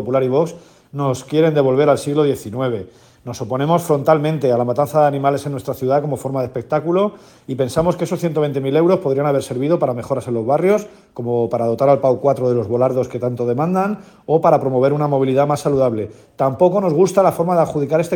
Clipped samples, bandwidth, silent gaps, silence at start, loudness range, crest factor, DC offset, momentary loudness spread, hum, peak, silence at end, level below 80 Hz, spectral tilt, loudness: under 0.1%; 18 kHz; none; 0 s; 2 LU; 16 dB; under 0.1%; 8 LU; none; 0 dBFS; 0 s; -54 dBFS; -7 dB/octave; -17 LUFS